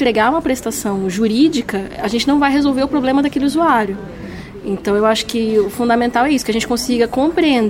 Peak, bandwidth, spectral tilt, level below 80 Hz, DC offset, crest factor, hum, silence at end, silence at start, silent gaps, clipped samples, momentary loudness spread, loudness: -2 dBFS; 16.5 kHz; -4.5 dB/octave; -42 dBFS; under 0.1%; 14 dB; none; 0 s; 0 s; none; under 0.1%; 9 LU; -16 LUFS